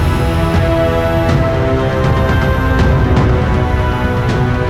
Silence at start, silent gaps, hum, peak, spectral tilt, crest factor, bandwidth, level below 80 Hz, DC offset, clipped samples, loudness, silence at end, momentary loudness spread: 0 s; none; none; -2 dBFS; -7.5 dB/octave; 10 dB; 15 kHz; -20 dBFS; under 0.1%; under 0.1%; -13 LUFS; 0 s; 3 LU